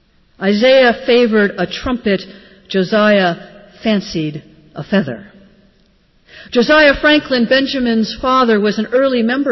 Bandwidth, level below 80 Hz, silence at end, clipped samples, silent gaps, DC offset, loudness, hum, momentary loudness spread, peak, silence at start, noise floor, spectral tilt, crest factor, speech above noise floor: 6.2 kHz; -42 dBFS; 0 s; under 0.1%; none; under 0.1%; -14 LUFS; none; 13 LU; -2 dBFS; 0.4 s; -53 dBFS; -6 dB/octave; 14 dB; 40 dB